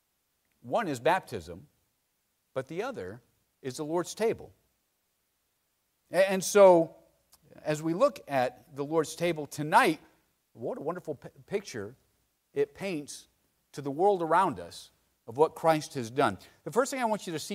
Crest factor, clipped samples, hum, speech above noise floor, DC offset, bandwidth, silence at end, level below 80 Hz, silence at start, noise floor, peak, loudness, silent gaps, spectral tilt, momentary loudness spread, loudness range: 22 dB; under 0.1%; none; 48 dB; under 0.1%; 16 kHz; 0 s; -70 dBFS; 0.65 s; -77 dBFS; -8 dBFS; -29 LUFS; none; -4.5 dB/octave; 17 LU; 11 LU